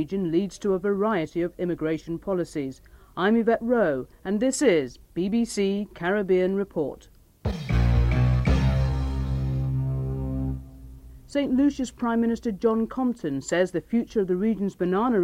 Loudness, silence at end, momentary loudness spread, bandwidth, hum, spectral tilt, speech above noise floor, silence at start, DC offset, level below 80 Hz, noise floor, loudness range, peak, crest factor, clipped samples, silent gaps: -25 LUFS; 0 s; 9 LU; 13.5 kHz; none; -7 dB/octave; 19 dB; 0 s; under 0.1%; -34 dBFS; -44 dBFS; 3 LU; -10 dBFS; 16 dB; under 0.1%; none